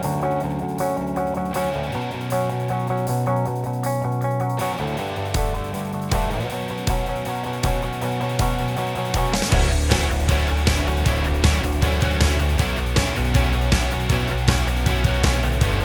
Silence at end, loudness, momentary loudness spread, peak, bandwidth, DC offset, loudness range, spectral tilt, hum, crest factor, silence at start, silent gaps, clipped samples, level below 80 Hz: 0 s; -22 LUFS; 6 LU; -2 dBFS; over 20 kHz; under 0.1%; 4 LU; -5 dB/octave; none; 20 dB; 0 s; none; under 0.1%; -26 dBFS